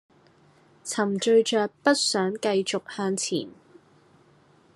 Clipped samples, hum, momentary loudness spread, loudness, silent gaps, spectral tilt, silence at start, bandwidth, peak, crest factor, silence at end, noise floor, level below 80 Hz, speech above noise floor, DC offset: under 0.1%; none; 11 LU; -25 LUFS; none; -3.5 dB/octave; 0.85 s; 12.5 kHz; -6 dBFS; 22 dB; 1.25 s; -58 dBFS; -78 dBFS; 34 dB; under 0.1%